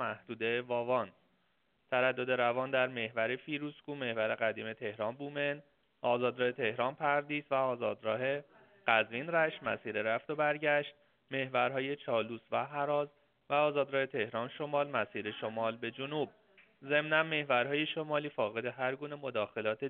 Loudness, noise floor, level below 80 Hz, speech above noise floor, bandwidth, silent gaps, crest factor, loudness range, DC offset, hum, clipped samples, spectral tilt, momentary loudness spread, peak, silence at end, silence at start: -34 LUFS; -76 dBFS; -80 dBFS; 42 dB; 4.4 kHz; none; 22 dB; 2 LU; under 0.1%; none; under 0.1%; -2.5 dB/octave; 8 LU; -12 dBFS; 0 s; 0 s